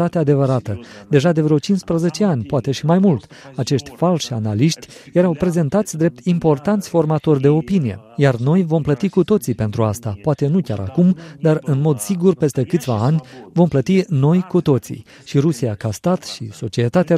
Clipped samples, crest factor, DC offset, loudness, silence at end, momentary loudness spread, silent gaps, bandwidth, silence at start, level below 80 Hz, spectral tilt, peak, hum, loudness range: under 0.1%; 16 dB; under 0.1%; -18 LUFS; 0 s; 7 LU; none; 15 kHz; 0 s; -50 dBFS; -7 dB/octave; 0 dBFS; none; 2 LU